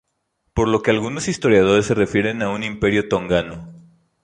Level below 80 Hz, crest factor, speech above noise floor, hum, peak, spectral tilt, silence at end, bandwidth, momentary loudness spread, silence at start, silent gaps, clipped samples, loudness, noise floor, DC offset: -42 dBFS; 18 dB; 53 dB; none; -2 dBFS; -5.5 dB/octave; 0.45 s; 11 kHz; 8 LU; 0.55 s; none; under 0.1%; -19 LUFS; -71 dBFS; under 0.1%